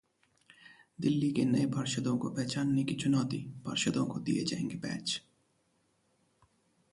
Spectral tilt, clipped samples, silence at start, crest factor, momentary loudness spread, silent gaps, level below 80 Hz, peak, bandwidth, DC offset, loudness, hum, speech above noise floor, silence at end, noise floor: -5 dB/octave; under 0.1%; 0.65 s; 16 dB; 7 LU; none; -68 dBFS; -18 dBFS; 11.5 kHz; under 0.1%; -33 LUFS; none; 42 dB; 1.75 s; -74 dBFS